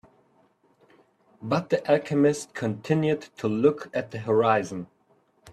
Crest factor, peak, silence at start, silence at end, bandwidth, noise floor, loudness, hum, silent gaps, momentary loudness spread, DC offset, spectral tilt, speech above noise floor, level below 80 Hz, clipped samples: 20 dB; -8 dBFS; 1.4 s; 0 s; 12.5 kHz; -65 dBFS; -25 LUFS; none; none; 11 LU; under 0.1%; -6.5 dB/octave; 40 dB; -66 dBFS; under 0.1%